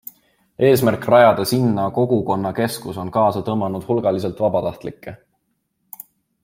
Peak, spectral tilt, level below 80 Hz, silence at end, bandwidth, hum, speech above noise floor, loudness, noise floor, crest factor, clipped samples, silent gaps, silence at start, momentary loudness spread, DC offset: -2 dBFS; -6.5 dB/octave; -56 dBFS; 1.3 s; 16.5 kHz; none; 52 dB; -18 LUFS; -70 dBFS; 18 dB; under 0.1%; none; 0.6 s; 23 LU; under 0.1%